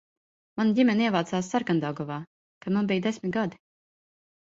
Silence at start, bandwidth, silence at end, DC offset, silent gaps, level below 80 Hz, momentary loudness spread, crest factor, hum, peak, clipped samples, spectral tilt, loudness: 0.55 s; 8 kHz; 0.95 s; under 0.1%; 2.27-2.61 s; -68 dBFS; 13 LU; 18 dB; none; -10 dBFS; under 0.1%; -6 dB/octave; -27 LUFS